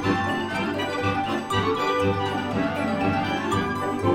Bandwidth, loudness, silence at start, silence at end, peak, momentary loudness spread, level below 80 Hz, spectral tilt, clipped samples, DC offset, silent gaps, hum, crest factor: 16 kHz; -25 LUFS; 0 s; 0 s; -10 dBFS; 3 LU; -50 dBFS; -6 dB/octave; under 0.1%; under 0.1%; none; none; 14 dB